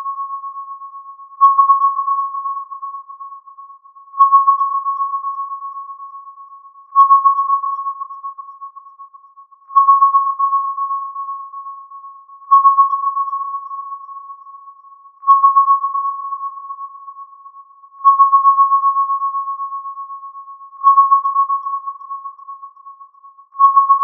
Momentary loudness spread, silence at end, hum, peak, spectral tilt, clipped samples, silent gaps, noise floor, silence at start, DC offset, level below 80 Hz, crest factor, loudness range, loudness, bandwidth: 24 LU; 0 s; none; -2 dBFS; 4.5 dB/octave; under 0.1%; none; -45 dBFS; 0 s; under 0.1%; under -90 dBFS; 16 dB; 2 LU; -14 LUFS; 3.5 kHz